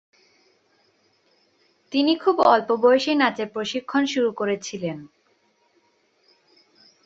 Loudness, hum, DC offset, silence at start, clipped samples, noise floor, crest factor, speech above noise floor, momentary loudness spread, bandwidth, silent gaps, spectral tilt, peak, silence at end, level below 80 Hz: -21 LUFS; none; under 0.1%; 1.9 s; under 0.1%; -65 dBFS; 22 dB; 44 dB; 12 LU; 8 kHz; none; -4.5 dB/octave; -2 dBFS; 2 s; -70 dBFS